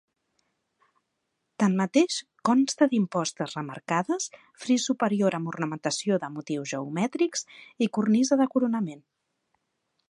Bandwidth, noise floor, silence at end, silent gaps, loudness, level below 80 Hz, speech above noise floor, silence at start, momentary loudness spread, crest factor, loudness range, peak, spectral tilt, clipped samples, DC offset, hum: 11 kHz; -79 dBFS; 1.1 s; none; -26 LUFS; -78 dBFS; 53 dB; 1.6 s; 10 LU; 20 dB; 2 LU; -8 dBFS; -5 dB/octave; under 0.1%; under 0.1%; none